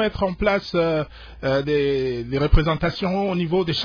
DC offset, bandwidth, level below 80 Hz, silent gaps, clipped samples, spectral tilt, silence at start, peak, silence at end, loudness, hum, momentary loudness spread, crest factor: under 0.1%; 5.4 kHz; -28 dBFS; none; under 0.1%; -7.5 dB/octave; 0 s; -4 dBFS; 0 s; -22 LUFS; none; 5 LU; 18 dB